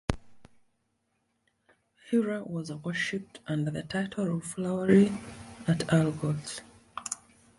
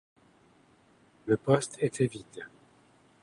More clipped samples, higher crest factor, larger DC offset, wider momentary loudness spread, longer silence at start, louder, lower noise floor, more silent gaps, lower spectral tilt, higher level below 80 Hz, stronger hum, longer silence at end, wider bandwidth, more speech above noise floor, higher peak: neither; about the same, 22 dB vs 24 dB; neither; second, 17 LU vs 20 LU; second, 0.1 s vs 1.25 s; about the same, -30 LUFS vs -29 LUFS; first, -76 dBFS vs -63 dBFS; neither; about the same, -6 dB/octave vs -6 dB/octave; first, -54 dBFS vs -68 dBFS; neither; second, 0.45 s vs 0.75 s; about the same, 11.5 kHz vs 11.5 kHz; first, 48 dB vs 34 dB; about the same, -8 dBFS vs -10 dBFS